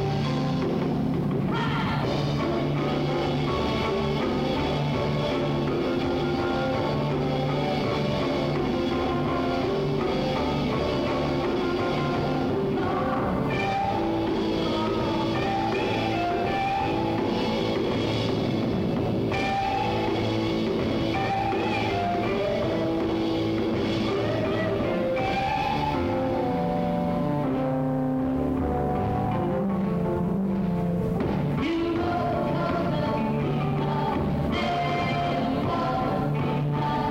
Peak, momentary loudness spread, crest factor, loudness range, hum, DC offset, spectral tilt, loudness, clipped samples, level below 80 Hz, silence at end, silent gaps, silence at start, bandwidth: -14 dBFS; 1 LU; 12 dB; 0 LU; none; under 0.1%; -7.5 dB/octave; -26 LUFS; under 0.1%; -42 dBFS; 0 s; none; 0 s; 16 kHz